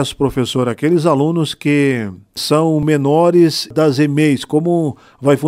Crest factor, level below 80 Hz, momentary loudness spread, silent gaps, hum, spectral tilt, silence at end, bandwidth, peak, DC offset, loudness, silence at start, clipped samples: 14 dB; -46 dBFS; 6 LU; none; none; -6 dB/octave; 0 s; 16 kHz; 0 dBFS; under 0.1%; -15 LUFS; 0 s; under 0.1%